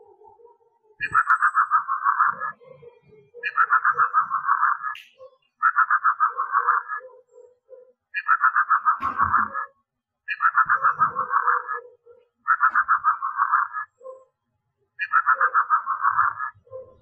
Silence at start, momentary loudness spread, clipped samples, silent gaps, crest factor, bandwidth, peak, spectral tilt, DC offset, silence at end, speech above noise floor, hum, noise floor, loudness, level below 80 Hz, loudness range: 1 s; 14 LU; under 0.1%; none; 16 dB; 8.6 kHz; -8 dBFS; -4 dB/octave; under 0.1%; 0.2 s; 56 dB; none; -76 dBFS; -21 LUFS; -66 dBFS; 2 LU